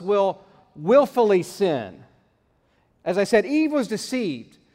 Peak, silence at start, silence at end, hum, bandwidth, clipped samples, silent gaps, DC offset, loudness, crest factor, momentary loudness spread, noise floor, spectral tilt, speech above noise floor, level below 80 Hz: -4 dBFS; 0 s; 0.3 s; none; 16 kHz; under 0.1%; none; under 0.1%; -22 LUFS; 18 dB; 14 LU; -65 dBFS; -5.5 dB/octave; 44 dB; -64 dBFS